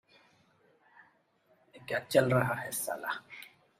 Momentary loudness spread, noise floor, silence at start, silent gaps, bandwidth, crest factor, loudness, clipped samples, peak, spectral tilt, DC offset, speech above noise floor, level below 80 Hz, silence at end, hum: 22 LU; -70 dBFS; 1.75 s; none; 16 kHz; 24 dB; -31 LUFS; under 0.1%; -12 dBFS; -5 dB/octave; under 0.1%; 39 dB; -70 dBFS; 0.3 s; none